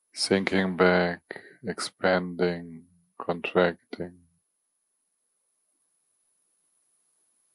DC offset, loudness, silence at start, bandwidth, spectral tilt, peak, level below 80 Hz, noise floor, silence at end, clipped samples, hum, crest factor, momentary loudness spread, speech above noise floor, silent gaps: under 0.1%; -27 LUFS; 0.15 s; 11.5 kHz; -5 dB/octave; -8 dBFS; -68 dBFS; -77 dBFS; 3.45 s; under 0.1%; none; 22 dB; 17 LU; 50 dB; none